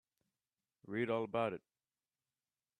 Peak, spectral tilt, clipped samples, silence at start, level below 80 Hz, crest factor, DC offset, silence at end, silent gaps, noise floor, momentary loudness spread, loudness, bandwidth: -22 dBFS; -7.5 dB/octave; under 0.1%; 0.85 s; -84 dBFS; 20 dB; under 0.1%; 1.2 s; none; under -90 dBFS; 9 LU; -39 LUFS; 10.5 kHz